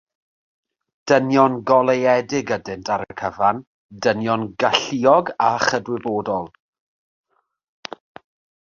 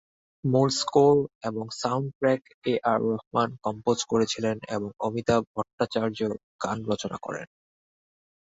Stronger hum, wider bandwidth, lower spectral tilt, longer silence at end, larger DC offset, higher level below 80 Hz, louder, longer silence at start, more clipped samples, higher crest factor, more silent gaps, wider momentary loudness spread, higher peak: neither; about the same, 7.4 kHz vs 8 kHz; about the same, -4.5 dB/octave vs -5.5 dB/octave; first, 2.2 s vs 1 s; neither; about the same, -58 dBFS vs -60 dBFS; first, -19 LUFS vs -27 LUFS; first, 1.05 s vs 0.45 s; neither; about the same, 20 dB vs 20 dB; second, 3.67-3.89 s vs 1.35-1.41 s, 2.15-2.21 s, 2.54-2.62 s, 3.27-3.31 s, 5.47-5.54 s, 5.73-5.78 s, 6.43-6.59 s; first, 19 LU vs 11 LU; first, 0 dBFS vs -8 dBFS